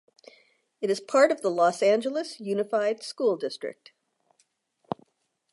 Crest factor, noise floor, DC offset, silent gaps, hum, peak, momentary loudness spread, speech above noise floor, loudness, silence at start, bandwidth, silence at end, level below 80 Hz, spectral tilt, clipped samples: 22 dB; -71 dBFS; under 0.1%; none; none; -6 dBFS; 17 LU; 46 dB; -26 LUFS; 0.8 s; 11.5 kHz; 1.8 s; -80 dBFS; -4.5 dB/octave; under 0.1%